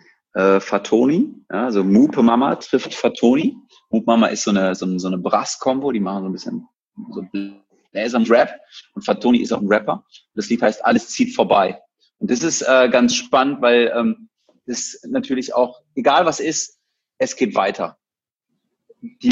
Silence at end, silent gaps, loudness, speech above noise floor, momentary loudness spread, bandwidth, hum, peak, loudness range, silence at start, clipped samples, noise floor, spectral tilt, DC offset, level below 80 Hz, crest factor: 0 s; 6.76-6.80 s; -18 LUFS; over 72 dB; 14 LU; 8 kHz; none; -2 dBFS; 5 LU; 0.35 s; under 0.1%; under -90 dBFS; -4.5 dB/octave; under 0.1%; -62 dBFS; 18 dB